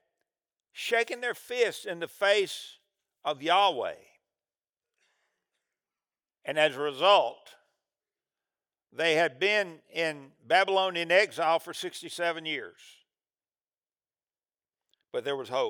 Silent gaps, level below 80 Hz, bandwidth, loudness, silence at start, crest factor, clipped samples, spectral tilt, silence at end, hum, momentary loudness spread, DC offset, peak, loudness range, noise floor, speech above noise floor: none; under -90 dBFS; over 20 kHz; -28 LUFS; 0.75 s; 22 dB; under 0.1%; -2.5 dB/octave; 0 s; none; 13 LU; under 0.1%; -8 dBFS; 8 LU; under -90 dBFS; over 62 dB